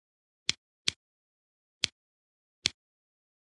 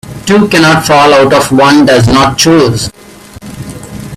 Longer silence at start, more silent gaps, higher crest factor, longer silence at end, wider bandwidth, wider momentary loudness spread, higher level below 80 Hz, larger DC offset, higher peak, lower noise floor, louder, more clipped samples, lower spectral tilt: first, 0.5 s vs 0.05 s; first, 0.57-0.85 s, 0.96-1.81 s, 1.92-2.62 s vs none; first, 38 dB vs 8 dB; first, 0.75 s vs 0 s; second, 11.5 kHz vs 15.5 kHz; second, 1 LU vs 19 LU; second, -70 dBFS vs -32 dBFS; second, under 0.1% vs 0.2%; about the same, -2 dBFS vs 0 dBFS; first, under -90 dBFS vs -28 dBFS; second, -34 LUFS vs -6 LUFS; second, under 0.1% vs 0.4%; second, 0 dB/octave vs -4.5 dB/octave